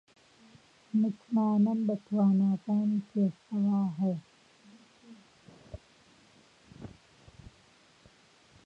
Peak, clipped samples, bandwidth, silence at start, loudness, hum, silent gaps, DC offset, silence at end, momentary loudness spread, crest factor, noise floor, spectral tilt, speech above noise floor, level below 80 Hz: -18 dBFS; under 0.1%; 6.6 kHz; 0.95 s; -29 LUFS; none; none; under 0.1%; 1.8 s; 24 LU; 14 dB; -62 dBFS; -9.5 dB/octave; 34 dB; -66 dBFS